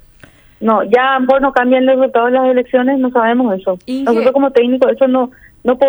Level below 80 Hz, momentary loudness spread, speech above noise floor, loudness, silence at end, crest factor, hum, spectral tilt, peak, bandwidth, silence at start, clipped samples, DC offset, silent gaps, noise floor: -50 dBFS; 7 LU; 31 dB; -13 LUFS; 0 s; 12 dB; none; -6.5 dB/octave; 0 dBFS; over 20 kHz; 0.6 s; under 0.1%; under 0.1%; none; -43 dBFS